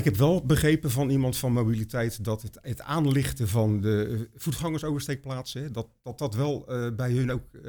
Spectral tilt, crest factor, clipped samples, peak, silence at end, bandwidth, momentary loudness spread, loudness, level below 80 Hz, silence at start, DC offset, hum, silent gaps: -6.5 dB/octave; 18 dB; under 0.1%; -10 dBFS; 0 s; over 20 kHz; 12 LU; -27 LUFS; -46 dBFS; 0 s; under 0.1%; none; none